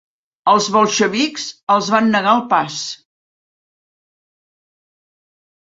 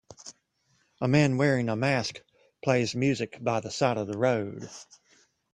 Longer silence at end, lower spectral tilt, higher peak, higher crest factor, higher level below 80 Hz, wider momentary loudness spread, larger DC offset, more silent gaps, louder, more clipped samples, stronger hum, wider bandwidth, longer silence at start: first, 2.7 s vs 0.7 s; second, -3.5 dB/octave vs -6 dB/octave; first, -2 dBFS vs -8 dBFS; about the same, 18 dB vs 20 dB; about the same, -64 dBFS vs -64 dBFS; second, 12 LU vs 22 LU; neither; first, 1.63-1.67 s vs none; first, -16 LUFS vs -27 LUFS; neither; neither; second, 8 kHz vs 10.5 kHz; first, 0.45 s vs 0.25 s